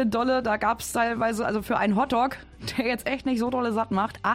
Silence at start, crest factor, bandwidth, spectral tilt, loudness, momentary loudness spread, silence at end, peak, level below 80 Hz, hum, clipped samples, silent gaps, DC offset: 0 s; 14 dB; 16.5 kHz; -5 dB/octave; -25 LUFS; 4 LU; 0 s; -12 dBFS; -50 dBFS; none; under 0.1%; none; under 0.1%